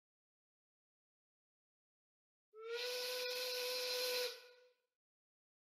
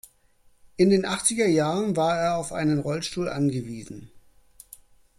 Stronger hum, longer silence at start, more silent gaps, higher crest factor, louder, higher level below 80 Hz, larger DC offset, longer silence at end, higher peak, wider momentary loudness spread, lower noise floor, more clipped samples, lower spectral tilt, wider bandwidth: neither; first, 2.55 s vs 0.8 s; neither; about the same, 18 dB vs 18 dB; second, -41 LUFS vs -24 LUFS; second, under -90 dBFS vs -56 dBFS; neither; first, 1.15 s vs 1 s; second, -30 dBFS vs -6 dBFS; second, 10 LU vs 17 LU; first, -68 dBFS vs -60 dBFS; neither; second, 3.5 dB/octave vs -5 dB/octave; about the same, 15.5 kHz vs 15.5 kHz